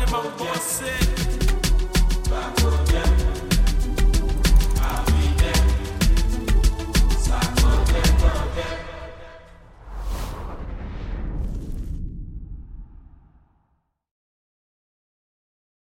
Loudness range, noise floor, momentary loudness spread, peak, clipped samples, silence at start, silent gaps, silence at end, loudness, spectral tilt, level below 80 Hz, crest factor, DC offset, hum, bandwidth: 14 LU; -70 dBFS; 17 LU; -6 dBFS; under 0.1%; 0 s; none; 2.95 s; -23 LUFS; -4.5 dB/octave; -22 dBFS; 16 dB; under 0.1%; none; 16 kHz